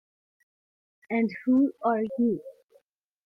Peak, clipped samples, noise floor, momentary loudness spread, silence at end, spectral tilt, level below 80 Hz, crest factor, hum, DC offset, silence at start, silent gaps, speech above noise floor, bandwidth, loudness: -14 dBFS; under 0.1%; -66 dBFS; 6 LU; 0.75 s; -9.5 dB/octave; -76 dBFS; 16 dB; none; under 0.1%; 1.1 s; none; 41 dB; 5.4 kHz; -27 LUFS